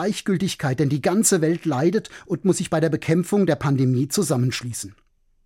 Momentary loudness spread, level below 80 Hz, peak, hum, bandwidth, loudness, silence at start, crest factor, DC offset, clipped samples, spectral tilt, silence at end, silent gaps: 9 LU; -56 dBFS; -6 dBFS; none; 16.5 kHz; -21 LUFS; 0 s; 16 dB; under 0.1%; under 0.1%; -5.5 dB/octave; 0.55 s; none